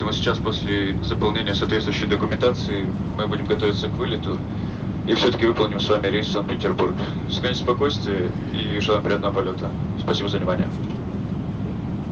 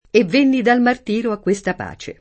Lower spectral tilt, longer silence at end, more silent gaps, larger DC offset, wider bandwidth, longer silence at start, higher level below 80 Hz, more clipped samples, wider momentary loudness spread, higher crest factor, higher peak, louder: about the same, -6.5 dB/octave vs -5.5 dB/octave; about the same, 0 s vs 0.1 s; neither; neither; second, 7.6 kHz vs 8.8 kHz; second, 0 s vs 0.15 s; first, -38 dBFS vs -52 dBFS; neither; second, 7 LU vs 11 LU; about the same, 18 dB vs 16 dB; second, -6 dBFS vs -2 dBFS; second, -23 LUFS vs -17 LUFS